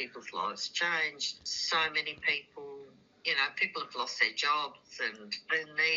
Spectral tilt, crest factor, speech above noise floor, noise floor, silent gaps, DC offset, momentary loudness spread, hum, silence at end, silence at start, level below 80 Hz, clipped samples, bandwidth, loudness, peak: 2.5 dB/octave; 20 dB; 20 dB; -53 dBFS; none; under 0.1%; 11 LU; none; 0 s; 0 s; -76 dBFS; under 0.1%; 7.6 kHz; -31 LUFS; -14 dBFS